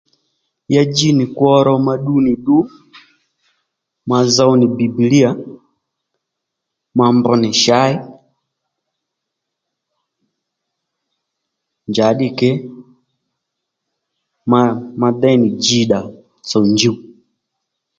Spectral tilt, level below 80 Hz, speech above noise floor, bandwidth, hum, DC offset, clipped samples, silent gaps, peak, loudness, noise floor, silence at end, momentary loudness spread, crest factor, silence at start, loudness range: -5 dB/octave; -56 dBFS; 65 dB; 7.8 kHz; none; under 0.1%; under 0.1%; none; 0 dBFS; -14 LUFS; -78 dBFS; 1 s; 14 LU; 16 dB; 0.7 s; 6 LU